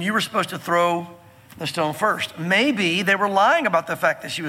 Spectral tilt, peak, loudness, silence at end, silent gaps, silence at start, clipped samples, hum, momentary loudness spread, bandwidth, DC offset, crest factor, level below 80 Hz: -4 dB/octave; -4 dBFS; -20 LUFS; 0 s; none; 0 s; under 0.1%; none; 9 LU; 17 kHz; under 0.1%; 18 dB; -68 dBFS